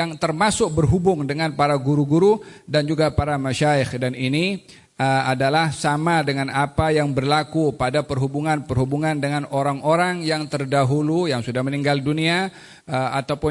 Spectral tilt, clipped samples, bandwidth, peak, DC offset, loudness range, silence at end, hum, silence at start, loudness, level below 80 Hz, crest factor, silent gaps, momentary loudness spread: -6 dB/octave; under 0.1%; 11.5 kHz; -6 dBFS; under 0.1%; 2 LU; 0 s; none; 0 s; -21 LUFS; -44 dBFS; 14 dB; none; 5 LU